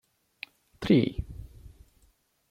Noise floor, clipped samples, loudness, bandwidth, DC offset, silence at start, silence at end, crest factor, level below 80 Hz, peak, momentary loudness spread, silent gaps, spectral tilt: -67 dBFS; under 0.1%; -27 LUFS; 15 kHz; under 0.1%; 0.8 s; 0.85 s; 22 dB; -46 dBFS; -10 dBFS; 22 LU; none; -8 dB/octave